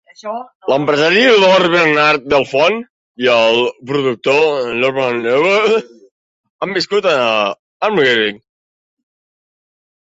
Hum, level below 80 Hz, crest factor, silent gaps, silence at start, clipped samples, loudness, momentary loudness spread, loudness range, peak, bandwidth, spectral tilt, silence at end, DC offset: none; -58 dBFS; 14 dB; 0.55-0.60 s, 2.90-3.15 s, 6.11-6.44 s, 6.50-6.59 s, 7.59-7.80 s; 0.25 s; under 0.1%; -13 LUFS; 10 LU; 5 LU; 0 dBFS; 8 kHz; -4.5 dB/octave; 1.7 s; under 0.1%